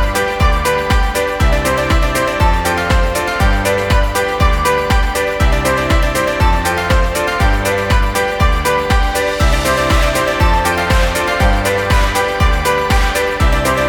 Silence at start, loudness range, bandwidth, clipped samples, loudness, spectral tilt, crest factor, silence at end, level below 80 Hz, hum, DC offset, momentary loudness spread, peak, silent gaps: 0 s; 1 LU; 18.5 kHz; under 0.1%; -14 LUFS; -4.5 dB/octave; 12 dB; 0 s; -16 dBFS; none; under 0.1%; 2 LU; 0 dBFS; none